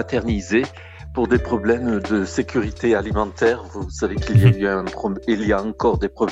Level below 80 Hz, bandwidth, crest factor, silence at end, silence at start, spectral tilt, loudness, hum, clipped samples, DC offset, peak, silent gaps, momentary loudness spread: -34 dBFS; 10.5 kHz; 18 dB; 0 s; 0 s; -7 dB/octave; -20 LUFS; none; under 0.1%; under 0.1%; -2 dBFS; none; 9 LU